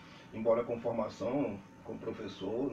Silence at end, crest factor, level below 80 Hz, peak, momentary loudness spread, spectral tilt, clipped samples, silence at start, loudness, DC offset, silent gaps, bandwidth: 0 s; 18 dB; -66 dBFS; -18 dBFS; 14 LU; -7 dB/octave; under 0.1%; 0 s; -36 LUFS; under 0.1%; none; 7.8 kHz